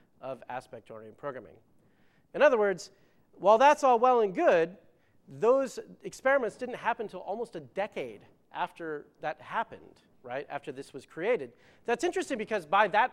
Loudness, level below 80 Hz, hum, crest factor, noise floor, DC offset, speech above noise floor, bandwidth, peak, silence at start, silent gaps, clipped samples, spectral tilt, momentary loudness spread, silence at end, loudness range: -29 LUFS; -72 dBFS; none; 20 dB; -64 dBFS; under 0.1%; 35 dB; 13 kHz; -8 dBFS; 0.25 s; none; under 0.1%; -4.5 dB/octave; 19 LU; 0.05 s; 12 LU